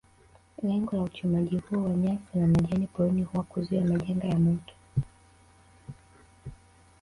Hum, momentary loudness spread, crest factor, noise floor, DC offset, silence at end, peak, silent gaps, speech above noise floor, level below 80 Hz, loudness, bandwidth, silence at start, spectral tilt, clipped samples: none; 22 LU; 14 dB; -59 dBFS; under 0.1%; 0.5 s; -14 dBFS; none; 32 dB; -52 dBFS; -28 LUFS; 11 kHz; 0.6 s; -9 dB/octave; under 0.1%